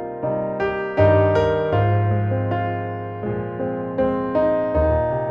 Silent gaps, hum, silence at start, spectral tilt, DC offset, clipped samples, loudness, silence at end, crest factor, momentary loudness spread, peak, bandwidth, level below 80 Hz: none; none; 0 s; -9.5 dB/octave; under 0.1%; under 0.1%; -21 LUFS; 0 s; 16 dB; 10 LU; -4 dBFS; 6.2 kHz; -36 dBFS